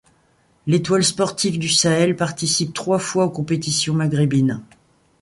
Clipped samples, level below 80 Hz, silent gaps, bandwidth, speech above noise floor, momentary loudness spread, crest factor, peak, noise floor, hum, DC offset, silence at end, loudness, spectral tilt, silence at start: under 0.1%; -56 dBFS; none; 11.5 kHz; 40 dB; 5 LU; 18 dB; -2 dBFS; -59 dBFS; none; under 0.1%; 0.6 s; -19 LUFS; -4.5 dB/octave; 0.65 s